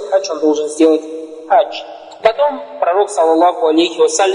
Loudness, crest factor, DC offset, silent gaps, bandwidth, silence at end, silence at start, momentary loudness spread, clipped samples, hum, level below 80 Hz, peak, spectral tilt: -14 LUFS; 14 dB; under 0.1%; none; 10.5 kHz; 0 s; 0 s; 10 LU; under 0.1%; none; -62 dBFS; 0 dBFS; -2 dB/octave